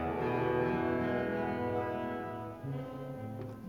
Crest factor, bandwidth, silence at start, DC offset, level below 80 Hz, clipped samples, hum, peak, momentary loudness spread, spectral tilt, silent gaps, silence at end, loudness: 14 dB; 17.5 kHz; 0 s; under 0.1%; -58 dBFS; under 0.1%; none; -20 dBFS; 11 LU; -8.5 dB/octave; none; 0 s; -35 LUFS